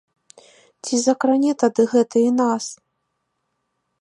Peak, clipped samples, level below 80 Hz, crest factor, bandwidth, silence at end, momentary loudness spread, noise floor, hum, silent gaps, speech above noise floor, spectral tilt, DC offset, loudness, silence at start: -4 dBFS; under 0.1%; -76 dBFS; 18 dB; 11.5 kHz; 1.3 s; 9 LU; -74 dBFS; none; none; 56 dB; -4 dB/octave; under 0.1%; -19 LUFS; 0.85 s